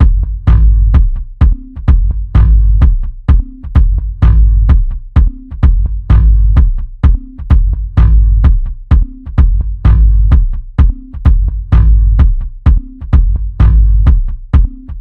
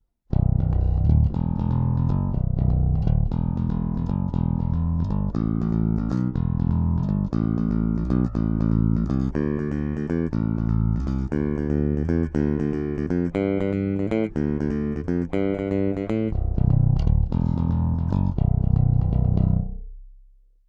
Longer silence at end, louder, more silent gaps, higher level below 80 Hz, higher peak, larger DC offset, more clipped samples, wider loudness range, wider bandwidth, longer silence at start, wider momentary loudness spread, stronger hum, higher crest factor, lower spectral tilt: second, 0 s vs 0.55 s; first, -12 LUFS vs -24 LUFS; neither; first, -8 dBFS vs -28 dBFS; first, 0 dBFS vs -6 dBFS; first, 0.8% vs under 0.1%; first, 0.6% vs under 0.1%; about the same, 1 LU vs 2 LU; second, 3.4 kHz vs 6 kHz; second, 0 s vs 0.3 s; about the same, 6 LU vs 5 LU; neither; second, 8 dB vs 16 dB; about the same, -10 dB/octave vs -11 dB/octave